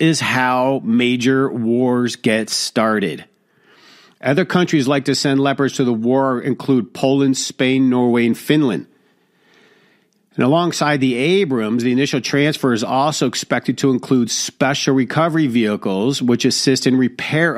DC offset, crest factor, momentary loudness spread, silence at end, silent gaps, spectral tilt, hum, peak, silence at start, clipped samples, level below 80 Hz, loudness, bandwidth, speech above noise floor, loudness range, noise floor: under 0.1%; 16 dB; 4 LU; 0 s; none; -5 dB/octave; none; -2 dBFS; 0 s; under 0.1%; -62 dBFS; -17 LUFS; 15 kHz; 42 dB; 2 LU; -58 dBFS